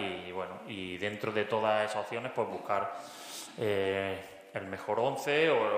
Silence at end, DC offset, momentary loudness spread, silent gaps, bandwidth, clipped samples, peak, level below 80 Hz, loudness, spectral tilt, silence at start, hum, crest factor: 0 s; under 0.1%; 13 LU; none; 15.5 kHz; under 0.1%; -14 dBFS; -74 dBFS; -33 LUFS; -4.5 dB/octave; 0 s; none; 18 dB